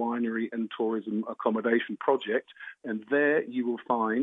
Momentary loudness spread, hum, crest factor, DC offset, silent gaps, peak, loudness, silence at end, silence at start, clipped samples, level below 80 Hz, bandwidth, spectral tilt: 8 LU; none; 18 dB; under 0.1%; none; -12 dBFS; -29 LUFS; 0 s; 0 s; under 0.1%; -86 dBFS; 3.9 kHz; -8 dB/octave